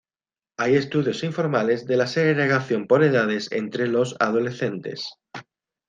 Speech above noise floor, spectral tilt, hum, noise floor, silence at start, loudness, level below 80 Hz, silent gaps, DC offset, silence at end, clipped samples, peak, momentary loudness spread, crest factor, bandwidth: over 68 dB; -6 dB/octave; none; under -90 dBFS; 0.6 s; -22 LUFS; -68 dBFS; none; under 0.1%; 0.45 s; under 0.1%; -4 dBFS; 14 LU; 18 dB; 9.4 kHz